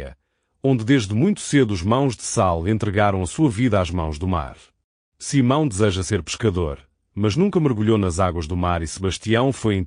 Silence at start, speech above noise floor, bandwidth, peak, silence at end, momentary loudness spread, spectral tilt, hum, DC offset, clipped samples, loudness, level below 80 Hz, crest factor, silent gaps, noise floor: 0 s; 47 dB; 10 kHz; -4 dBFS; 0 s; 7 LU; -6 dB/octave; none; under 0.1%; under 0.1%; -21 LUFS; -40 dBFS; 16 dB; 4.84-5.12 s; -67 dBFS